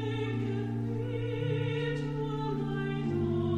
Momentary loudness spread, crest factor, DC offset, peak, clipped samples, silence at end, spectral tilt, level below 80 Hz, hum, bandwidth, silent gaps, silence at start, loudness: 3 LU; 12 dB; under 0.1%; -20 dBFS; under 0.1%; 0 s; -8.5 dB/octave; -52 dBFS; none; 8.8 kHz; none; 0 s; -33 LUFS